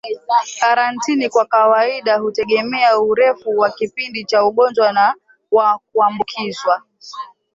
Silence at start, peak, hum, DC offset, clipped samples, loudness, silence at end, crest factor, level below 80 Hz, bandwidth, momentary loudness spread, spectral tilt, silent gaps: 0.05 s; -2 dBFS; none; under 0.1%; under 0.1%; -16 LUFS; 0.3 s; 14 dB; -64 dBFS; 7.8 kHz; 9 LU; -3.5 dB/octave; none